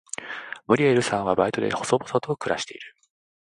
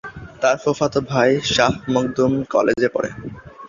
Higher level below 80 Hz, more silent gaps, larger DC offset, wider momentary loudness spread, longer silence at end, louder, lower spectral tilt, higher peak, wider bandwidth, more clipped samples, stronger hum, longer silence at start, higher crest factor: second, -60 dBFS vs -48 dBFS; neither; neither; first, 15 LU vs 10 LU; first, 0.5 s vs 0 s; second, -24 LUFS vs -19 LUFS; about the same, -5 dB/octave vs -5 dB/octave; about the same, -4 dBFS vs -2 dBFS; first, 11.5 kHz vs 7.6 kHz; neither; neither; first, 0.2 s vs 0.05 s; about the same, 22 dB vs 18 dB